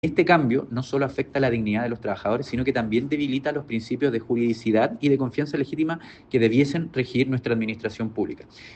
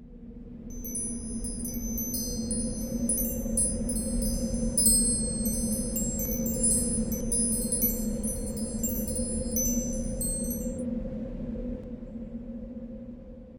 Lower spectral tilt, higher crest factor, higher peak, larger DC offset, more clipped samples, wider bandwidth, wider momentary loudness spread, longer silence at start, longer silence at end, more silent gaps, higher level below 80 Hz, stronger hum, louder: first, -7.5 dB/octave vs -4 dB/octave; about the same, 18 dB vs 22 dB; about the same, -6 dBFS vs -8 dBFS; second, under 0.1% vs 0.3%; neither; second, 8.6 kHz vs over 20 kHz; second, 9 LU vs 16 LU; about the same, 0.05 s vs 0 s; about the same, 0 s vs 0 s; neither; second, -54 dBFS vs -38 dBFS; neither; first, -24 LUFS vs -28 LUFS